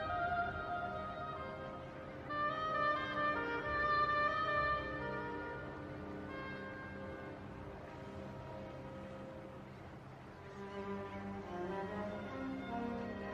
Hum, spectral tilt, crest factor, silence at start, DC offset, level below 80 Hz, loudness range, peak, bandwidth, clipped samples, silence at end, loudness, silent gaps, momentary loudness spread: none; -6.5 dB/octave; 16 dB; 0 s; under 0.1%; -60 dBFS; 13 LU; -24 dBFS; 11 kHz; under 0.1%; 0 s; -40 LUFS; none; 15 LU